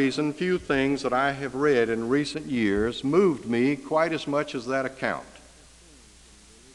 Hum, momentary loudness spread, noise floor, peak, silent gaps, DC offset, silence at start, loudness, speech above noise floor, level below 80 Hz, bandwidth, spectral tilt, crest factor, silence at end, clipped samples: none; 6 LU; -52 dBFS; -8 dBFS; none; under 0.1%; 0 s; -25 LUFS; 27 dB; -54 dBFS; 11.5 kHz; -5.5 dB/octave; 16 dB; 1.35 s; under 0.1%